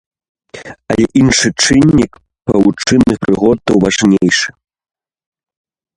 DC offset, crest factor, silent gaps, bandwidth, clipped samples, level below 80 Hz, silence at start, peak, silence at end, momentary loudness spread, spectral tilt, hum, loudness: under 0.1%; 12 dB; none; 11.5 kHz; under 0.1%; -38 dBFS; 0.55 s; 0 dBFS; 1.5 s; 12 LU; -4.5 dB/octave; none; -11 LUFS